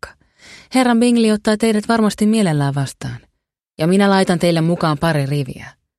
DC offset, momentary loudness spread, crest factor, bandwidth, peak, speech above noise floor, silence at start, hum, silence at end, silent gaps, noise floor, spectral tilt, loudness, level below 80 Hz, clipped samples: under 0.1%; 15 LU; 14 dB; 13 kHz; -2 dBFS; 55 dB; 0.05 s; none; 0.3 s; none; -70 dBFS; -6 dB/octave; -16 LUFS; -50 dBFS; under 0.1%